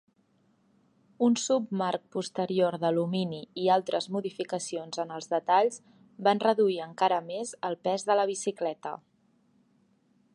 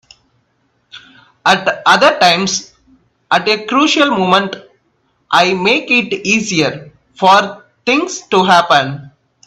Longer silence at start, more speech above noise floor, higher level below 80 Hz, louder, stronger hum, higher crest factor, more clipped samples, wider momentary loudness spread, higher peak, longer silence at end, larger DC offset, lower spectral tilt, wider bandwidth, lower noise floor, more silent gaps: first, 1.2 s vs 0.95 s; second, 40 dB vs 49 dB; second, -82 dBFS vs -56 dBFS; second, -29 LUFS vs -12 LUFS; neither; first, 20 dB vs 14 dB; neither; about the same, 10 LU vs 11 LU; second, -10 dBFS vs 0 dBFS; first, 1.4 s vs 0.4 s; neither; about the same, -4.5 dB/octave vs -3.5 dB/octave; second, 11.5 kHz vs 14 kHz; first, -68 dBFS vs -61 dBFS; neither